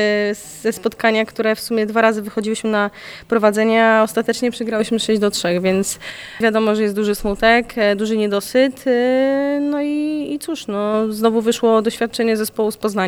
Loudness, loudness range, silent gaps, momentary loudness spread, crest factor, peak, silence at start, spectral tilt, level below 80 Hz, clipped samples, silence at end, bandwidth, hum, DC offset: -18 LUFS; 2 LU; none; 8 LU; 16 dB; -2 dBFS; 0 s; -4.5 dB/octave; -46 dBFS; under 0.1%; 0 s; over 20 kHz; none; under 0.1%